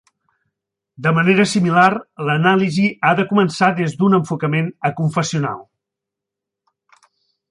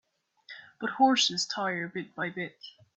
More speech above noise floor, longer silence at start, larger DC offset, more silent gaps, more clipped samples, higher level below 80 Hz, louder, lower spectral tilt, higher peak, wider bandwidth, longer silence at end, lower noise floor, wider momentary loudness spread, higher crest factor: first, 67 dB vs 24 dB; first, 1 s vs 0.5 s; neither; neither; neither; first, -62 dBFS vs -78 dBFS; first, -17 LUFS vs -28 LUFS; first, -6 dB/octave vs -2.5 dB/octave; first, -2 dBFS vs -10 dBFS; first, 11 kHz vs 8.4 kHz; first, 1.9 s vs 0.3 s; first, -84 dBFS vs -54 dBFS; second, 8 LU vs 24 LU; about the same, 16 dB vs 20 dB